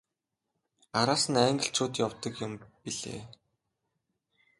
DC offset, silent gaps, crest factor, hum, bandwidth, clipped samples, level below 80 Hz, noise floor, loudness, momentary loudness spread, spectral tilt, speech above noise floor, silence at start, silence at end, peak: under 0.1%; none; 24 dB; none; 11.5 kHz; under 0.1%; -66 dBFS; -86 dBFS; -30 LUFS; 15 LU; -3.5 dB/octave; 56 dB; 0.95 s; 1.25 s; -10 dBFS